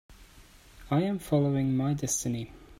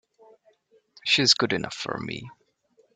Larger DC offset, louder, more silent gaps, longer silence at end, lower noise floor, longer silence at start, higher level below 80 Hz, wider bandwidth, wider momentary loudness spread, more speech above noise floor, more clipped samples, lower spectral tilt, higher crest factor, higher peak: neither; second, -29 LUFS vs -23 LUFS; neither; second, 0.05 s vs 0.65 s; second, -54 dBFS vs -65 dBFS; second, 0.1 s vs 1.05 s; first, -54 dBFS vs -64 dBFS; first, 16 kHz vs 12 kHz; second, 5 LU vs 16 LU; second, 26 dB vs 40 dB; neither; first, -6 dB/octave vs -2.5 dB/octave; second, 16 dB vs 22 dB; second, -14 dBFS vs -6 dBFS